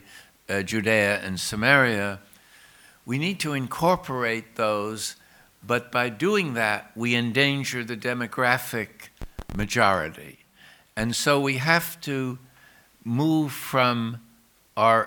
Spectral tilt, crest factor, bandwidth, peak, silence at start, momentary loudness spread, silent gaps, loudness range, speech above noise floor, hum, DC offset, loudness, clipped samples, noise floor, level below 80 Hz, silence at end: -4.5 dB/octave; 24 dB; over 20 kHz; -2 dBFS; 0.1 s; 13 LU; none; 3 LU; 34 dB; none; under 0.1%; -24 LUFS; under 0.1%; -59 dBFS; -50 dBFS; 0 s